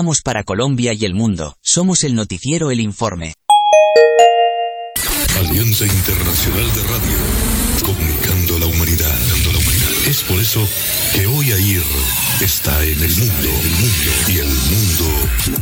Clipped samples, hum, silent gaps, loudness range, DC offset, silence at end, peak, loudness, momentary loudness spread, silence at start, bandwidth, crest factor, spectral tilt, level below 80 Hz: under 0.1%; none; none; 2 LU; under 0.1%; 0 s; 0 dBFS; -14 LUFS; 7 LU; 0 s; over 20 kHz; 14 dB; -4 dB/octave; -26 dBFS